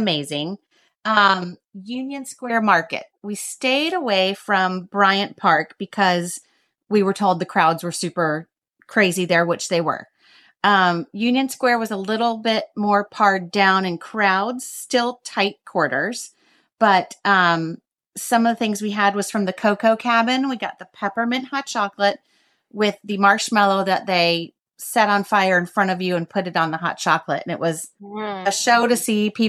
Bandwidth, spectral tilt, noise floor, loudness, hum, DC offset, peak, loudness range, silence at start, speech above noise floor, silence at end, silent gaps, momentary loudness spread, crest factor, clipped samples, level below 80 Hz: 14.5 kHz; -4 dB/octave; -54 dBFS; -20 LUFS; none; under 0.1%; -2 dBFS; 2 LU; 0 s; 34 dB; 0 s; none; 13 LU; 18 dB; under 0.1%; -74 dBFS